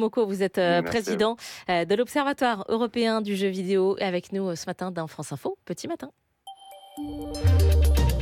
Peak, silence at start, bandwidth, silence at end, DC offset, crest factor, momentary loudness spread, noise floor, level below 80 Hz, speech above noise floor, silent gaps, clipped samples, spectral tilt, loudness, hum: -10 dBFS; 0 s; 16 kHz; 0 s; under 0.1%; 14 dB; 14 LU; -47 dBFS; -32 dBFS; 22 dB; none; under 0.1%; -6 dB/octave; -26 LUFS; none